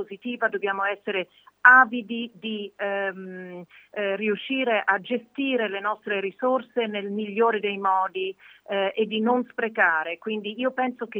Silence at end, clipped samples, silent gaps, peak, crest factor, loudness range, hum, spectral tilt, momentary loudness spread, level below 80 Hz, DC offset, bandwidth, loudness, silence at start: 0 s; under 0.1%; none; -2 dBFS; 24 dB; 5 LU; none; -6.5 dB/octave; 11 LU; -84 dBFS; under 0.1%; over 20 kHz; -24 LUFS; 0 s